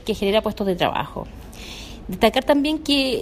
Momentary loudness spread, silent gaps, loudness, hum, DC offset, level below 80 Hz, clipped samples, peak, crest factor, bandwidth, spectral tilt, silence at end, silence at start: 16 LU; none; -20 LUFS; none; under 0.1%; -40 dBFS; under 0.1%; -2 dBFS; 20 dB; 15.5 kHz; -5 dB/octave; 0 s; 0 s